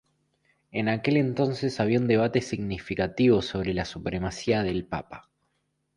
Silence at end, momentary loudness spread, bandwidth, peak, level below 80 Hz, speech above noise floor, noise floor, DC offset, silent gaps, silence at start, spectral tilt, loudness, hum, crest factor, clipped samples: 0.75 s; 10 LU; 11 kHz; -10 dBFS; -50 dBFS; 49 dB; -75 dBFS; under 0.1%; none; 0.75 s; -6.5 dB/octave; -26 LUFS; none; 18 dB; under 0.1%